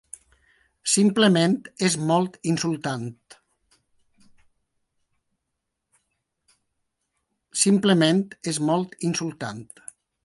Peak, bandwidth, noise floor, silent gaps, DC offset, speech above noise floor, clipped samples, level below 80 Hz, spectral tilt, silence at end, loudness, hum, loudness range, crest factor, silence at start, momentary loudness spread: -4 dBFS; 11.5 kHz; -81 dBFS; none; under 0.1%; 58 dB; under 0.1%; -68 dBFS; -4.5 dB/octave; 0.6 s; -22 LUFS; none; 11 LU; 20 dB; 0.85 s; 20 LU